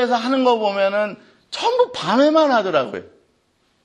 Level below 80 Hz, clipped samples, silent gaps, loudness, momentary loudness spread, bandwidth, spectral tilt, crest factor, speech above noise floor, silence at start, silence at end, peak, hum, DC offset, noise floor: -70 dBFS; under 0.1%; none; -18 LUFS; 12 LU; 10.5 kHz; -4.5 dB/octave; 16 dB; 46 dB; 0 s; 0.85 s; -4 dBFS; none; under 0.1%; -64 dBFS